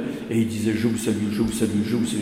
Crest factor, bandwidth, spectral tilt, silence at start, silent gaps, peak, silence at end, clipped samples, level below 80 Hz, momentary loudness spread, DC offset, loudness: 14 dB; 16 kHz; -5.5 dB/octave; 0 s; none; -8 dBFS; 0 s; under 0.1%; -50 dBFS; 2 LU; under 0.1%; -23 LUFS